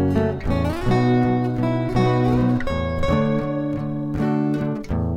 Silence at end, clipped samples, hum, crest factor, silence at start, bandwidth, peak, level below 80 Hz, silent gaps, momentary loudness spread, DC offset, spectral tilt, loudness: 0 s; under 0.1%; none; 14 dB; 0 s; 11 kHz; -6 dBFS; -34 dBFS; none; 6 LU; under 0.1%; -8.5 dB/octave; -21 LUFS